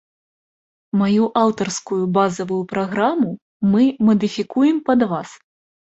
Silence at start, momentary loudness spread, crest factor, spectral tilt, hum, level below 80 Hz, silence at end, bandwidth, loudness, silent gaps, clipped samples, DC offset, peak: 0.95 s; 8 LU; 16 dB; -6 dB/octave; none; -58 dBFS; 0.6 s; 8.2 kHz; -19 LUFS; 3.42-3.60 s; under 0.1%; under 0.1%; -2 dBFS